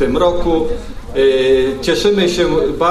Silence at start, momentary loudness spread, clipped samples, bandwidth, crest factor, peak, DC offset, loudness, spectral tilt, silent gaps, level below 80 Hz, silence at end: 0 s; 7 LU; under 0.1%; 13 kHz; 12 dB; -2 dBFS; under 0.1%; -14 LUFS; -5 dB/octave; none; -28 dBFS; 0 s